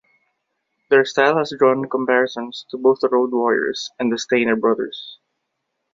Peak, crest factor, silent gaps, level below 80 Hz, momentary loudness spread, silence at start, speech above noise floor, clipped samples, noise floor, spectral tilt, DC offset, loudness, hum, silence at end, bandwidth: -2 dBFS; 18 dB; none; -66 dBFS; 11 LU; 0.9 s; 57 dB; under 0.1%; -76 dBFS; -4.5 dB/octave; under 0.1%; -18 LUFS; none; 0.8 s; 7.6 kHz